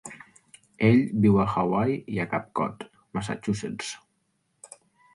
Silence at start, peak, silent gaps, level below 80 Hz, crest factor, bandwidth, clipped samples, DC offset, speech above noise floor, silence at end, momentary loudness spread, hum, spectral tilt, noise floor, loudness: 0.05 s; -8 dBFS; none; -54 dBFS; 20 dB; 11.5 kHz; under 0.1%; under 0.1%; 49 dB; 1.2 s; 18 LU; none; -7 dB/octave; -73 dBFS; -26 LUFS